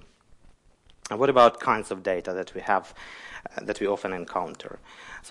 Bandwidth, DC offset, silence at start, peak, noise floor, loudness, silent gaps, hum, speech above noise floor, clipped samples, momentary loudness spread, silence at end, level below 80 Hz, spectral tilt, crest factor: 11.5 kHz; under 0.1%; 1.05 s; -6 dBFS; -58 dBFS; -25 LUFS; none; none; 31 dB; under 0.1%; 23 LU; 0 s; -58 dBFS; -4.5 dB/octave; 22 dB